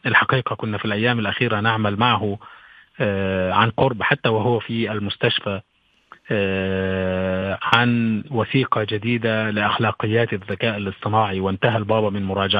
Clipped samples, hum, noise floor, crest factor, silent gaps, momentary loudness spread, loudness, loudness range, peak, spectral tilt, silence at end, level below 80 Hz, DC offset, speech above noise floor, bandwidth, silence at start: under 0.1%; none; -51 dBFS; 20 dB; none; 6 LU; -21 LUFS; 2 LU; 0 dBFS; -8 dB/octave; 0 s; -56 dBFS; under 0.1%; 30 dB; 6.4 kHz; 0.05 s